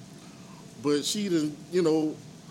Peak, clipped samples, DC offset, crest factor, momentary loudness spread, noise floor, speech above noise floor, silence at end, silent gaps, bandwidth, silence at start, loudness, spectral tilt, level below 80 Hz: -14 dBFS; under 0.1%; under 0.1%; 16 dB; 21 LU; -47 dBFS; 20 dB; 0 s; none; 17 kHz; 0 s; -28 LUFS; -4.5 dB/octave; -70 dBFS